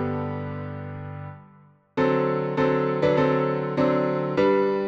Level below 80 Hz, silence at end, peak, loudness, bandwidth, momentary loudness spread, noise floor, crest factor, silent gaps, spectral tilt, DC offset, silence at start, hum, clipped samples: -58 dBFS; 0 s; -8 dBFS; -24 LUFS; 7.2 kHz; 15 LU; -54 dBFS; 16 dB; none; -8.5 dB/octave; under 0.1%; 0 s; 50 Hz at -65 dBFS; under 0.1%